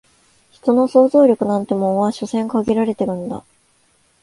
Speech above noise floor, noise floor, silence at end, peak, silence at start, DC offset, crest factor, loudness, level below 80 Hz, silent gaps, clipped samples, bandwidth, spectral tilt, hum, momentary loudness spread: 43 dB; -59 dBFS; 0.8 s; 0 dBFS; 0.65 s; under 0.1%; 16 dB; -17 LUFS; -56 dBFS; none; under 0.1%; 11.5 kHz; -7.5 dB/octave; none; 11 LU